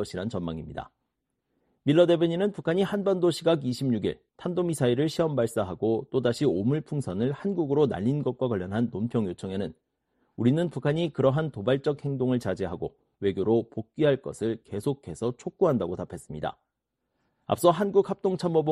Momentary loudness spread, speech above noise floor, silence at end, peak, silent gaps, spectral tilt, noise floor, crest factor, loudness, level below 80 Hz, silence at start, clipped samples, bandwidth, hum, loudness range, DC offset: 10 LU; 56 dB; 0 s; -6 dBFS; none; -7 dB/octave; -82 dBFS; 20 dB; -27 LUFS; -60 dBFS; 0 s; under 0.1%; 13 kHz; none; 3 LU; under 0.1%